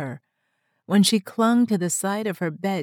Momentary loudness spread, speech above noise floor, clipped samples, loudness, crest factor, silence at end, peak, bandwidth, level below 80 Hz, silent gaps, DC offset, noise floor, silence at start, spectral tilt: 9 LU; 52 dB; under 0.1%; -22 LUFS; 18 dB; 0 s; -6 dBFS; 18 kHz; -80 dBFS; none; under 0.1%; -73 dBFS; 0 s; -4.5 dB/octave